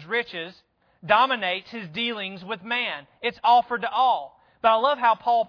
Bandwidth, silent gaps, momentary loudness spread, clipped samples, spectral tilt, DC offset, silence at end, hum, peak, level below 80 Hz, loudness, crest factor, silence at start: 5.4 kHz; none; 14 LU; under 0.1%; -5 dB/octave; under 0.1%; 0 s; none; -4 dBFS; -68 dBFS; -23 LUFS; 20 dB; 0 s